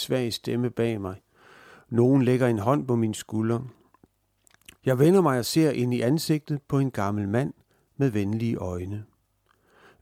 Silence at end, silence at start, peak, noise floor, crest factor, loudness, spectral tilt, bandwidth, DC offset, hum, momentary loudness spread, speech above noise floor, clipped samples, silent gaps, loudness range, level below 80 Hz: 0.95 s; 0 s; -8 dBFS; -68 dBFS; 18 dB; -25 LUFS; -6.5 dB/octave; 16.5 kHz; under 0.1%; none; 12 LU; 44 dB; under 0.1%; none; 4 LU; -62 dBFS